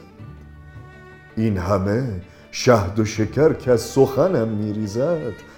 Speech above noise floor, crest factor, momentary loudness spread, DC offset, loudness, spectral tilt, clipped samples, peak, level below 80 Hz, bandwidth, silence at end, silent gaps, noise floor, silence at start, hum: 24 dB; 20 dB; 16 LU; under 0.1%; -20 LUFS; -6.5 dB/octave; under 0.1%; 0 dBFS; -46 dBFS; 19 kHz; 0.05 s; none; -43 dBFS; 0 s; none